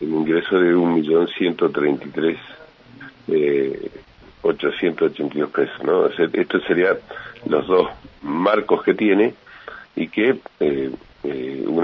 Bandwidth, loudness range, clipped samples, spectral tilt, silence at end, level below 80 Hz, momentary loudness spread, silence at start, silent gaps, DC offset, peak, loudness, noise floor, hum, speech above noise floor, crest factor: 5.8 kHz; 3 LU; under 0.1%; -8.5 dB/octave; 0 s; -56 dBFS; 15 LU; 0 s; none; under 0.1%; -2 dBFS; -20 LUFS; -42 dBFS; none; 23 dB; 18 dB